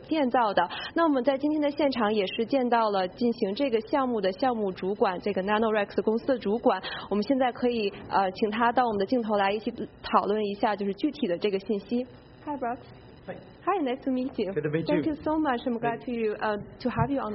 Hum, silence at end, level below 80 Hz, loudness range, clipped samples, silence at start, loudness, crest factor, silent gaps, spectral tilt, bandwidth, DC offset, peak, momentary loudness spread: none; 0 s; -58 dBFS; 5 LU; under 0.1%; 0 s; -27 LUFS; 20 dB; none; -4 dB/octave; 5.8 kHz; under 0.1%; -8 dBFS; 8 LU